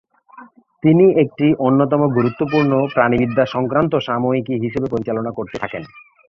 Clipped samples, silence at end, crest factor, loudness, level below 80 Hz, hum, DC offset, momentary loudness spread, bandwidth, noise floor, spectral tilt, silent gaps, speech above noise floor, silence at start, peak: under 0.1%; 0.3 s; 16 dB; -17 LUFS; -52 dBFS; none; under 0.1%; 12 LU; 6.6 kHz; -43 dBFS; -9 dB/octave; none; 27 dB; 0.35 s; -2 dBFS